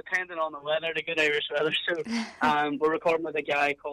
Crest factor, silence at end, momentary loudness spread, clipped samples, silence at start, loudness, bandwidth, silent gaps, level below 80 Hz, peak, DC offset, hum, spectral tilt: 14 dB; 0 s; 5 LU; under 0.1%; 0.05 s; -27 LUFS; 13 kHz; none; -68 dBFS; -12 dBFS; under 0.1%; none; -4 dB/octave